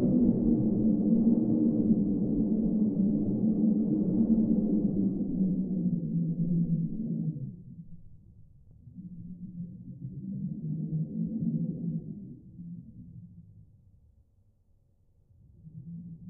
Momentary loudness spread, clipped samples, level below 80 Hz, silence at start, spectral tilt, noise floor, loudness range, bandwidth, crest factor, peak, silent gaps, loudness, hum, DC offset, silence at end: 21 LU; under 0.1%; -50 dBFS; 0 s; -16.5 dB/octave; -66 dBFS; 15 LU; 1.2 kHz; 16 dB; -12 dBFS; none; -29 LUFS; none; under 0.1%; 0 s